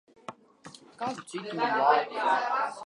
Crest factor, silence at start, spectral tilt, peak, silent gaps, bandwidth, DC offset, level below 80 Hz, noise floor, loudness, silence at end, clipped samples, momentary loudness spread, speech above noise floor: 20 dB; 0.3 s; -4 dB/octave; -10 dBFS; none; 11.5 kHz; under 0.1%; -82 dBFS; -52 dBFS; -28 LUFS; 0.05 s; under 0.1%; 22 LU; 24 dB